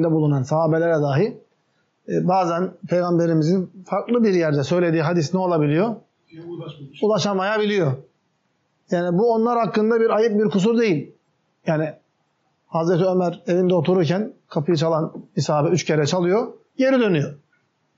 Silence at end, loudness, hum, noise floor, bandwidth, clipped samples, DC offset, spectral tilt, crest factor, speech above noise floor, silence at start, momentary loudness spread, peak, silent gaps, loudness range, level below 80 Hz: 0.6 s; -20 LUFS; none; -68 dBFS; 7.6 kHz; under 0.1%; under 0.1%; -6.5 dB/octave; 12 dB; 49 dB; 0 s; 9 LU; -8 dBFS; none; 2 LU; -70 dBFS